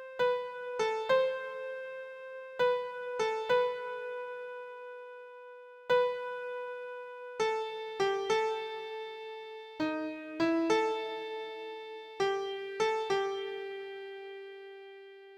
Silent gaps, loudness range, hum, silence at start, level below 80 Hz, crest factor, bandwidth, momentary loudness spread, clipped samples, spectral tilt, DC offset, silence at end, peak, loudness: none; 3 LU; none; 0 s; -76 dBFS; 18 dB; 11 kHz; 16 LU; under 0.1%; -3.5 dB/octave; under 0.1%; 0 s; -16 dBFS; -34 LUFS